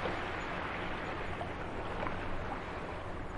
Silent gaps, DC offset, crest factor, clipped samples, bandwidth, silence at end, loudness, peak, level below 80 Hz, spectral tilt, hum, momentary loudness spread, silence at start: none; under 0.1%; 20 dB; under 0.1%; 11 kHz; 0 s; -39 LUFS; -18 dBFS; -46 dBFS; -6 dB/octave; none; 3 LU; 0 s